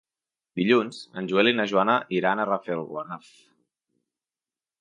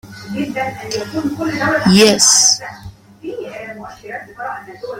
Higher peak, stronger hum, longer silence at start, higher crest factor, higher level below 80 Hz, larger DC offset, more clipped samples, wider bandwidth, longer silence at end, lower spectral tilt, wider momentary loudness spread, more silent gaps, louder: second, -6 dBFS vs 0 dBFS; neither; first, 0.55 s vs 0.05 s; about the same, 20 dB vs 18 dB; second, -74 dBFS vs -48 dBFS; neither; neither; second, 10.5 kHz vs 16.5 kHz; first, 1.65 s vs 0 s; first, -6 dB/octave vs -2.5 dB/octave; second, 14 LU vs 22 LU; neither; second, -24 LUFS vs -13 LUFS